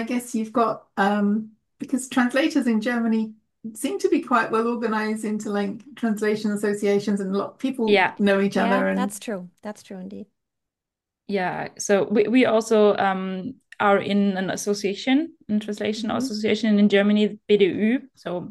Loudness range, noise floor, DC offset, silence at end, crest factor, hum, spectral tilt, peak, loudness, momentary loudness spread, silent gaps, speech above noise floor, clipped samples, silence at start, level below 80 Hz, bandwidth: 4 LU; -87 dBFS; under 0.1%; 0 s; 18 dB; none; -5.5 dB/octave; -6 dBFS; -22 LUFS; 13 LU; none; 64 dB; under 0.1%; 0 s; -68 dBFS; 12.5 kHz